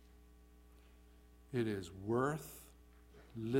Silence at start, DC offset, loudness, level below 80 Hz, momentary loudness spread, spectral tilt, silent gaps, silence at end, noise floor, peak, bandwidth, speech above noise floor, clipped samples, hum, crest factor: 0 s; under 0.1%; -40 LUFS; -64 dBFS; 25 LU; -6.5 dB/octave; none; 0 s; -62 dBFS; -22 dBFS; 16.5 kHz; 24 dB; under 0.1%; 60 Hz at -60 dBFS; 20 dB